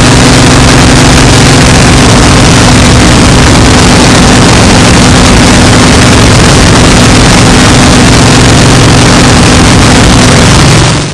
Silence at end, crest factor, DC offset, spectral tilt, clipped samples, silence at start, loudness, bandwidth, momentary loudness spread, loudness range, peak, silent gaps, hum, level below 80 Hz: 0 s; 2 dB; 0.8%; -4 dB/octave; 20%; 0 s; -1 LUFS; 12 kHz; 0 LU; 0 LU; 0 dBFS; none; none; -12 dBFS